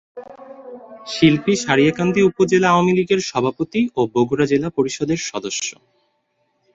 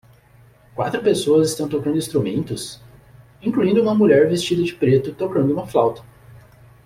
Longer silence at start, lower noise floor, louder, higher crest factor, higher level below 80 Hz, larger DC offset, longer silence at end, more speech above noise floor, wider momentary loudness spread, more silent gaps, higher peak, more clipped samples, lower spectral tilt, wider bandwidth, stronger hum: second, 0.15 s vs 0.75 s; first, -68 dBFS vs -51 dBFS; about the same, -18 LUFS vs -19 LUFS; about the same, 18 dB vs 16 dB; about the same, -54 dBFS vs -54 dBFS; neither; first, 1.05 s vs 0.5 s; first, 50 dB vs 32 dB; first, 23 LU vs 12 LU; neither; about the same, -2 dBFS vs -4 dBFS; neither; about the same, -5 dB/octave vs -6 dB/octave; second, 8 kHz vs 16 kHz; neither